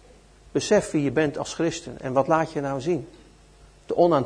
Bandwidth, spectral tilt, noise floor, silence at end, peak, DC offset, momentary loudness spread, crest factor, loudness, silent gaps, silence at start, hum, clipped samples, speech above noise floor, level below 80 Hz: 10.5 kHz; -5.5 dB/octave; -52 dBFS; 0 s; -6 dBFS; under 0.1%; 8 LU; 18 dB; -25 LUFS; none; 0.55 s; none; under 0.1%; 29 dB; -54 dBFS